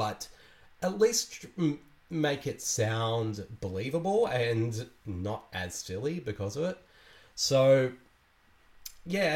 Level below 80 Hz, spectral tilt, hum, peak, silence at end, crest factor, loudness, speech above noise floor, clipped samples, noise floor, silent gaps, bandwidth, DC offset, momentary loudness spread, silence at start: -62 dBFS; -4.5 dB/octave; none; -12 dBFS; 0 s; 18 dB; -30 LUFS; 34 dB; under 0.1%; -64 dBFS; none; 16.5 kHz; under 0.1%; 15 LU; 0 s